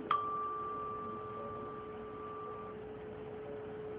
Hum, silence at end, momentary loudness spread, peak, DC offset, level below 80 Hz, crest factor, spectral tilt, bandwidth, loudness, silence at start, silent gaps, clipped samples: none; 0 s; 9 LU; -16 dBFS; under 0.1%; -66 dBFS; 24 dB; -4.5 dB/octave; 4.9 kHz; -42 LUFS; 0 s; none; under 0.1%